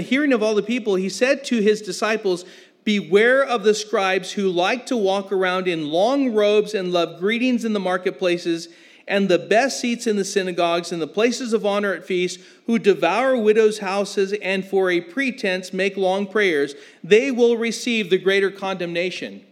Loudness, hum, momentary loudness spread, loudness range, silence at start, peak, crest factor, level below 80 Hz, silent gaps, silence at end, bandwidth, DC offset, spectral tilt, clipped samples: -20 LUFS; none; 7 LU; 2 LU; 0 s; -2 dBFS; 18 dB; -88 dBFS; none; 0.1 s; 14 kHz; under 0.1%; -4.5 dB/octave; under 0.1%